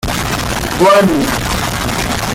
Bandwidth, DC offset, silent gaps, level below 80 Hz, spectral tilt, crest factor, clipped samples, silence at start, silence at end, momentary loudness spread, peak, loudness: 17 kHz; under 0.1%; none; -28 dBFS; -4 dB/octave; 12 dB; under 0.1%; 0.05 s; 0 s; 8 LU; -2 dBFS; -13 LUFS